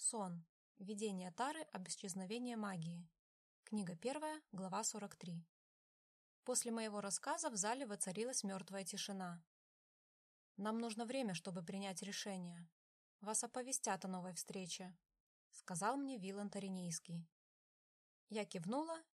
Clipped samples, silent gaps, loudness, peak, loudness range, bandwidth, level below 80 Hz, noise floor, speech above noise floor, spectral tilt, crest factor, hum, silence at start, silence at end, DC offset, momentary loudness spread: under 0.1%; 0.49-0.75 s, 3.19-3.63 s, 5.49-6.43 s, 9.47-10.55 s, 12.72-13.19 s, 15.20-15.51 s, 17.32-18.27 s; -45 LUFS; -24 dBFS; 4 LU; 13.5 kHz; under -90 dBFS; under -90 dBFS; over 44 dB; -3.5 dB/octave; 24 dB; none; 0 s; 0.15 s; under 0.1%; 12 LU